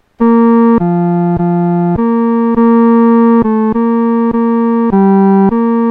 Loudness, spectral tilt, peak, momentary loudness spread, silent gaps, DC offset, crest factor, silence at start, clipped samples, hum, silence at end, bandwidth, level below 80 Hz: -10 LUFS; -12 dB/octave; 0 dBFS; 4 LU; none; under 0.1%; 8 dB; 0.2 s; under 0.1%; none; 0 s; 3.4 kHz; -40 dBFS